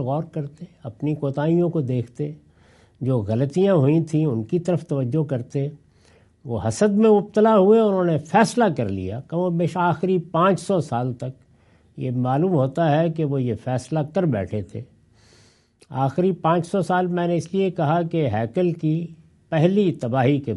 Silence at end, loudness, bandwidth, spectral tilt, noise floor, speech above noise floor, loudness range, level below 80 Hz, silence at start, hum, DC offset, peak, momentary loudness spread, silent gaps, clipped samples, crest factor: 0 s; -21 LUFS; 11.5 kHz; -7.5 dB/octave; -56 dBFS; 35 dB; 6 LU; -60 dBFS; 0 s; none; under 0.1%; -2 dBFS; 13 LU; none; under 0.1%; 18 dB